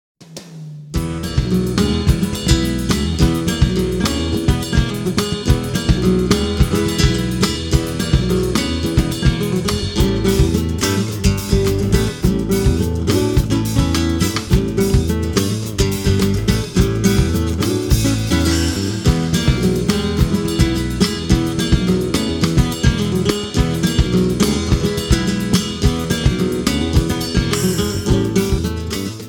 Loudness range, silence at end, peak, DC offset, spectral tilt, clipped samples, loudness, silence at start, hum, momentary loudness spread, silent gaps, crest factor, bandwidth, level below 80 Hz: 1 LU; 0 s; 0 dBFS; under 0.1%; -5.5 dB/octave; under 0.1%; -17 LUFS; 0.2 s; none; 3 LU; none; 16 dB; 19 kHz; -24 dBFS